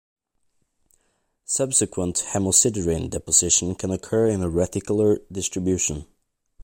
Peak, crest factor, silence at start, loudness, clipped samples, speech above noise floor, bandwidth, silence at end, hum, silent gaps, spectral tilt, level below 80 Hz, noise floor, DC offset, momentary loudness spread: -2 dBFS; 22 dB; 1.5 s; -21 LUFS; under 0.1%; 48 dB; 16.5 kHz; 0 s; none; none; -4 dB/octave; -46 dBFS; -71 dBFS; under 0.1%; 9 LU